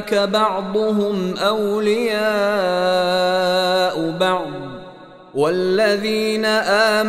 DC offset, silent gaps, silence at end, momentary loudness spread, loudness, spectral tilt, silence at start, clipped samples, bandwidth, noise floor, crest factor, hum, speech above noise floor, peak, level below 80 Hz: under 0.1%; none; 0 s; 5 LU; -18 LUFS; -4.5 dB/octave; 0 s; under 0.1%; 15.5 kHz; -40 dBFS; 14 dB; none; 22 dB; -4 dBFS; -56 dBFS